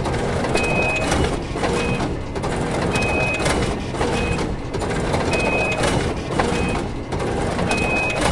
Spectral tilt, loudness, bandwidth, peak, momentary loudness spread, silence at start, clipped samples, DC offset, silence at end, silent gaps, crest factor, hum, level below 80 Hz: -5 dB/octave; -21 LUFS; 11.5 kHz; -2 dBFS; 6 LU; 0 s; under 0.1%; under 0.1%; 0 s; none; 18 dB; none; -32 dBFS